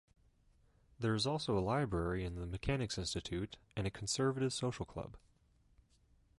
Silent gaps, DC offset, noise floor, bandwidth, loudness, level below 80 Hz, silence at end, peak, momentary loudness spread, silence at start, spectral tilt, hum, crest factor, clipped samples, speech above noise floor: none; under 0.1%; -71 dBFS; 11.5 kHz; -38 LUFS; -54 dBFS; 1.25 s; -24 dBFS; 9 LU; 1 s; -5 dB/octave; none; 16 dB; under 0.1%; 33 dB